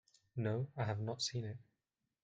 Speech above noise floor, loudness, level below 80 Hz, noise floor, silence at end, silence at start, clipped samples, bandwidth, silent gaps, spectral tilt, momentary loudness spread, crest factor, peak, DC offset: 49 dB; -41 LUFS; -74 dBFS; -89 dBFS; 0.6 s; 0.35 s; under 0.1%; 9.2 kHz; none; -5 dB/octave; 10 LU; 18 dB; -24 dBFS; under 0.1%